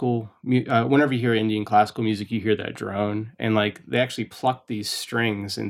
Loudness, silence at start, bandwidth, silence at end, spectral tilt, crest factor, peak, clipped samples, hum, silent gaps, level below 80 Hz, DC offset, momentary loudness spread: -24 LUFS; 0 s; 16.5 kHz; 0 s; -6 dB/octave; 18 dB; -6 dBFS; under 0.1%; none; none; -66 dBFS; under 0.1%; 7 LU